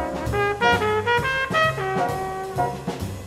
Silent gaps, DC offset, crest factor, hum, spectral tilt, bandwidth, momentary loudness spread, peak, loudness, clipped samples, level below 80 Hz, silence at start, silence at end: none; under 0.1%; 18 dB; none; -5 dB/octave; 16 kHz; 9 LU; -6 dBFS; -22 LUFS; under 0.1%; -42 dBFS; 0 s; 0 s